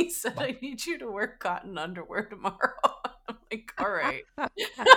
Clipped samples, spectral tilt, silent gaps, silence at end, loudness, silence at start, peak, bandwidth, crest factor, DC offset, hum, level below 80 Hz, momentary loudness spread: under 0.1%; -2.5 dB/octave; none; 0 s; -31 LUFS; 0 s; -2 dBFS; 19 kHz; 26 dB; under 0.1%; none; -62 dBFS; 11 LU